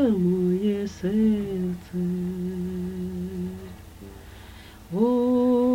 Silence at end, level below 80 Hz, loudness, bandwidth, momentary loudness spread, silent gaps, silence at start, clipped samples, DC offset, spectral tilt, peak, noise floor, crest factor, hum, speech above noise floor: 0 s; -48 dBFS; -25 LUFS; 17 kHz; 23 LU; none; 0 s; under 0.1%; under 0.1%; -8.5 dB/octave; -10 dBFS; -44 dBFS; 14 dB; none; 20 dB